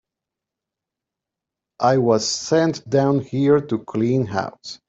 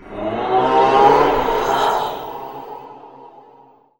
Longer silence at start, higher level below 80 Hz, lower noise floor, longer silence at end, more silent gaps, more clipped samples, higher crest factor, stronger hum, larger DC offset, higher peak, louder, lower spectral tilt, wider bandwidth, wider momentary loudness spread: first, 1.8 s vs 0.05 s; second, -62 dBFS vs -42 dBFS; first, -86 dBFS vs -49 dBFS; second, 0.15 s vs 0.7 s; neither; neither; about the same, 18 dB vs 18 dB; neither; second, under 0.1% vs 0.1%; second, -4 dBFS vs 0 dBFS; second, -20 LUFS vs -16 LUFS; about the same, -5.5 dB/octave vs -5 dB/octave; second, 8.2 kHz vs 16.5 kHz; second, 7 LU vs 20 LU